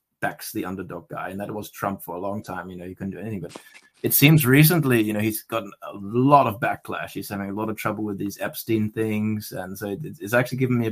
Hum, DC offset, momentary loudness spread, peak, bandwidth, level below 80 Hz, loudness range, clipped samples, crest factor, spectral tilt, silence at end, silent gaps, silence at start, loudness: none; under 0.1%; 17 LU; 0 dBFS; 15.5 kHz; -58 dBFS; 12 LU; under 0.1%; 22 dB; -5.5 dB/octave; 0 s; none; 0.2 s; -23 LUFS